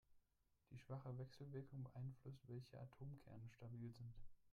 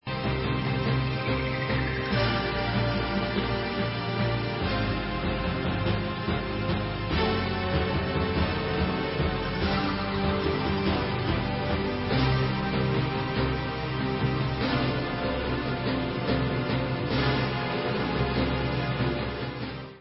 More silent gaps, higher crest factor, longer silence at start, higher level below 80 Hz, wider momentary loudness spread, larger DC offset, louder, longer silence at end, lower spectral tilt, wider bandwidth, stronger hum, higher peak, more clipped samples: neither; about the same, 14 dB vs 16 dB; about the same, 0.1 s vs 0.05 s; second, -72 dBFS vs -38 dBFS; first, 7 LU vs 3 LU; neither; second, -57 LUFS vs -28 LUFS; about the same, 0 s vs 0 s; second, -8.5 dB/octave vs -10.5 dB/octave; first, 11 kHz vs 5.8 kHz; neither; second, -42 dBFS vs -10 dBFS; neither